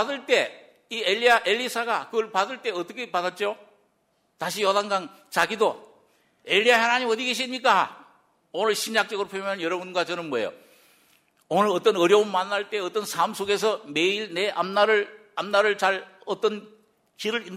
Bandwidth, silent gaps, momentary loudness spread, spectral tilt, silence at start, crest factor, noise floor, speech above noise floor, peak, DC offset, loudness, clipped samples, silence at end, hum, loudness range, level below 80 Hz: 16 kHz; none; 11 LU; -3 dB/octave; 0 s; 20 dB; -69 dBFS; 45 dB; -6 dBFS; under 0.1%; -24 LUFS; under 0.1%; 0 s; none; 5 LU; -74 dBFS